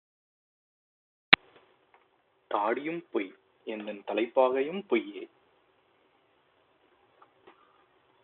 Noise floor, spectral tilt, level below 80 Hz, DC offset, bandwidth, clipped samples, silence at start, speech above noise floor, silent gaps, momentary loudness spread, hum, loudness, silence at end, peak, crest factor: -69 dBFS; -1 dB/octave; -76 dBFS; under 0.1%; 4.3 kHz; under 0.1%; 1.3 s; 39 dB; none; 20 LU; none; -29 LUFS; 2.95 s; 0 dBFS; 32 dB